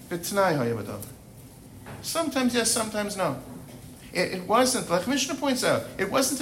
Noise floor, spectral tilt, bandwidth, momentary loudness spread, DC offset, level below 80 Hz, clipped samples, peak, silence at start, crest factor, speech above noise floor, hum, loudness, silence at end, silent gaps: -47 dBFS; -3.5 dB/octave; 16.5 kHz; 20 LU; under 0.1%; -56 dBFS; under 0.1%; -10 dBFS; 0 s; 18 dB; 21 dB; none; -26 LUFS; 0 s; none